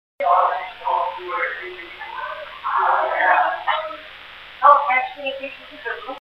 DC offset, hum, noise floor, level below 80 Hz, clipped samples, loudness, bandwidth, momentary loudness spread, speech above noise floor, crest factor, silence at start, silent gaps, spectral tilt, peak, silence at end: under 0.1%; none; -40 dBFS; -60 dBFS; under 0.1%; -20 LUFS; 5.8 kHz; 18 LU; 17 dB; 22 dB; 0.2 s; none; -3.5 dB/octave; 0 dBFS; 0.05 s